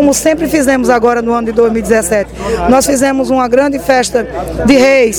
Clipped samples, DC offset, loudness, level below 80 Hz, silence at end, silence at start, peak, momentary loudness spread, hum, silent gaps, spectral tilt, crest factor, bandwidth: 0.2%; under 0.1%; -11 LUFS; -30 dBFS; 0 s; 0 s; 0 dBFS; 6 LU; none; none; -4 dB/octave; 10 dB; over 20 kHz